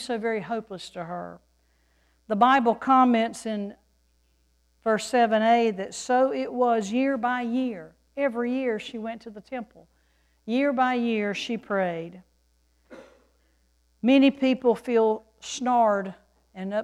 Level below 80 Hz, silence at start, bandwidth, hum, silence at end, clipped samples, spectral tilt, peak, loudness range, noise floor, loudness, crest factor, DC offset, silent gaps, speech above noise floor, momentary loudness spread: -66 dBFS; 0 s; 11.5 kHz; none; 0 s; under 0.1%; -5 dB/octave; -6 dBFS; 5 LU; -66 dBFS; -24 LUFS; 20 dB; under 0.1%; none; 42 dB; 18 LU